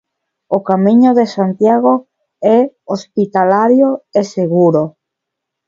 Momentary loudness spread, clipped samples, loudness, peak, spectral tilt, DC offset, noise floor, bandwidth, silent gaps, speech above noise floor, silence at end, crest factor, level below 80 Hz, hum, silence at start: 9 LU; under 0.1%; -13 LUFS; 0 dBFS; -8 dB/octave; under 0.1%; -78 dBFS; 7.4 kHz; none; 66 dB; 0.8 s; 12 dB; -60 dBFS; none; 0.5 s